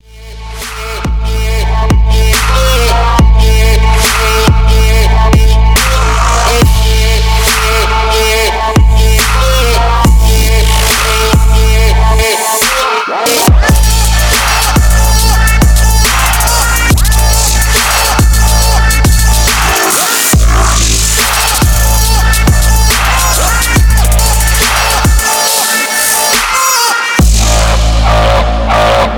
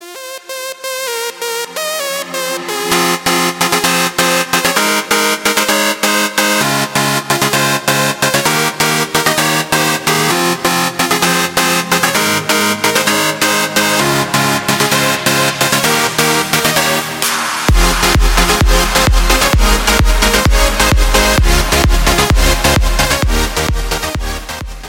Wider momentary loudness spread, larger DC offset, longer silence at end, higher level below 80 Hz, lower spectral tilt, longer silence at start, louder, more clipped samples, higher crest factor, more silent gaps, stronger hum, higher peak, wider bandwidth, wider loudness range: second, 2 LU vs 7 LU; neither; about the same, 0 s vs 0 s; first, -10 dBFS vs -20 dBFS; about the same, -3.5 dB/octave vs -3 dB/octave; first, 0.15 s vs 0 s; first, -8 LUFS vs -12 LUFS; neither; about the same, 8 dB vs 12 dB; neither; neither; about the same, 0 dBFS vs 0 dBFS; first, over 20 kHz vs 17.5 kHz; about the same, 1 LU vs 2 LU